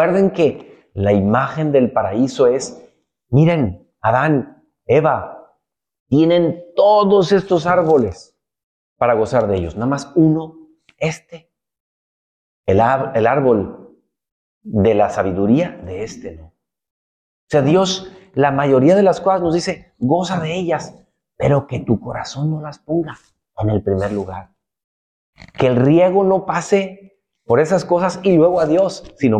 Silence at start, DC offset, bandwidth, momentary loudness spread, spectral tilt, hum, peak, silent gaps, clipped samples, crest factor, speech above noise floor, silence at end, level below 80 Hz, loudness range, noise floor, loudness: 0 s; under 0.1%; 9.6 kHz; 13 LU; -7 dB/octave; none; -4 dBFS; 6.00-6.06 s, 8.63-8.96 s, 11.80-12.64 s, 14.32-14.61 s, 16.91-17.47 s, 24.84-25.33 s; under 0.1%; 14 dB; 51 dB; 0 s; -48 dBFS; 5 LU; -67 dBFS; -16 LUFS